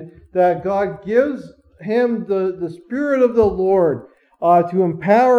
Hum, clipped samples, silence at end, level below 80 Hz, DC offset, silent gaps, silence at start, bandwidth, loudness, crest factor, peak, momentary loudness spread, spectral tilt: none; under 0.1%; 0 s; -50 dBFS; under 0.1%; none; 0 s; 7.2 kHz; -18 LUFS; 14 dB; -2 dBFS; 11 LU; -8.5 dB/octave